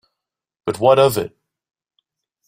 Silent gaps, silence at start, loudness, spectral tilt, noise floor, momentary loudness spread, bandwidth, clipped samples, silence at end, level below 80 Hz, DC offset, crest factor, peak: none; 0.65 s; -16 LUFS; -5 dB/octave; -82 dBFS; 16 LU; 16 kHz; under 0.1%; 1.2 s; -58 dBFS; under 0.1%; 20 dB; -2 dBFS